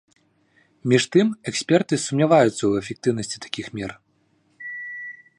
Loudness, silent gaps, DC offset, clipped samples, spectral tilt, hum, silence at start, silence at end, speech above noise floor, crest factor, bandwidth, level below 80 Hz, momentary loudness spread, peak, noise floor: -22 LUFS; none; under 0.1%; under 0.1%; -5 dB/octave; none; 0.85 s; 0.25 s; 44 dB; 20 dB; 11.5 kHz; -60 dBFS; 16 LU; -4 dBFS; -64 dBFS